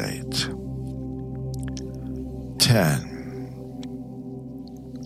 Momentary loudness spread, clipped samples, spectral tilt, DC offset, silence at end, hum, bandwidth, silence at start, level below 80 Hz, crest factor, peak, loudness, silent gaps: 17 LU; under 0.1%; -4.5 dB/octave; under 0.1%; 0 s; none; 16 kHz; 0 s; -44 dBFS; 22 dB; -6 dBFS; -27 LUFS; none